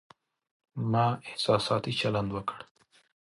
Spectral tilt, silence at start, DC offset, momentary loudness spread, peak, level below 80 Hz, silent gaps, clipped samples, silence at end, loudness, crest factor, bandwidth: -6 dB/octave; 0.75 s; under 0.1%; 11 LU; -10 dBFS; -60 dBFS; none; under 0.1%; 0.7 s; -29 LUFS; 22 dB; 11.5 kHz